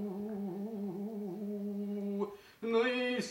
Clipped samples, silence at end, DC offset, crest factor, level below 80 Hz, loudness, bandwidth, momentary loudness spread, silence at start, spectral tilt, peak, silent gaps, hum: under 0.1%; 0 s; under 0.1%; 18 dB; -78 dBFS; -37 LUFS; 16.5 kHz; 9 LU; 0 s; -5.5 dB/octave; -20 dBFS; none; none